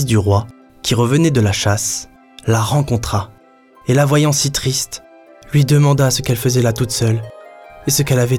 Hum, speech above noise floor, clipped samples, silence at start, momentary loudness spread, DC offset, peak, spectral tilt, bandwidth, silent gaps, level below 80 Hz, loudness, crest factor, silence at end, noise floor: none; 33 dB; under 0.1%; 0 s; 13 LU; under 0.1%; -2 dBFS; -5 dB/octave; 17 kHz; none; -40 dBFS; -16 LUFS; 12 dB; 0 s; -47 dBFS